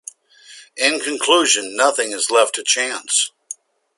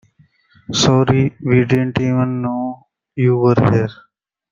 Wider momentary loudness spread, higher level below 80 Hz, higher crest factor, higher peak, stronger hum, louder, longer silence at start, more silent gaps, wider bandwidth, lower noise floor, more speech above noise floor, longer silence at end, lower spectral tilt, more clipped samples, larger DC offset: first, 20 LU vs 12 LU; second, -72 dBFS vs -48 dBFS; first, 20 dB vs 14 dB; about the same, 0 dBFS vs -2 dBFS; neither; about the same, -17 LUFS vs -16 LUFS; second, 0.5 s vs 0.7 s; neither; first, 11.5 kHz vs 7.6 kHz; second, -45 dBFS vs -54 dBFS; second, 27 dB vs 39 dB; second, 0.45 s vs 0.6 s; second, 1 dB/octave vs -6 dB/octave; neither; neither